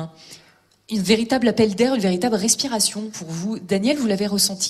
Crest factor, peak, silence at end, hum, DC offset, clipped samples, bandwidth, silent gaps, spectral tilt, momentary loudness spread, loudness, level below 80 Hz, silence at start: 18 dB; -2 dBFS; 0 s; none; under 0.1%; under 0.1%; 14 kHz; none; -3.5 dB/octave; 11 LU; -20 LUFS; -56 dBFS; 0 s